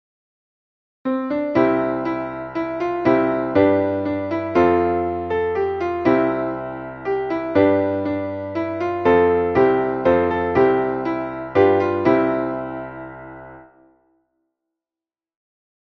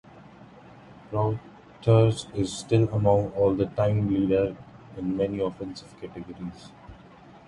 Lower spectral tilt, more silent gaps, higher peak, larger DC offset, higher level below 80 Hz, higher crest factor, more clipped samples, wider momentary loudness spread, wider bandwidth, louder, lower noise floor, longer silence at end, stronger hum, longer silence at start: about the same, -8.5 dB/octave vs -7.5 dB/octave; neither; first, -2 dBFS vs -6 dBFS; neither; about the same, -50 dBFS vs -50 dBFS; about the same, 18 dB vs 20 dB; neither; second, 11 LU vs 18 LU; second, 6.2 kHz vs 11 kHz; first, -20 LUFS vs -25 LUFS; first, under -90 dBFS vs -50 dBFS; first, 2.35 s vs 0.1 s; neither; first, 1.05 s vs 0.15 s